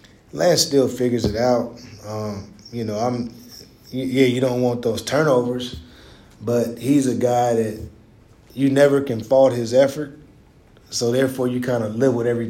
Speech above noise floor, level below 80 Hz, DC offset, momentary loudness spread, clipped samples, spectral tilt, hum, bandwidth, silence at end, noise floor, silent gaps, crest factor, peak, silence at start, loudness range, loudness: 31 dB; -50 dBFS; under 0.1%; 17 LU; under 0.1%; -5.5 dB/octave; none; 16.5 kHz; 0 s; -50 dBFS; none; 18 dB; -2 dBFS; 0.35 s; 4 LU; -20 LUFS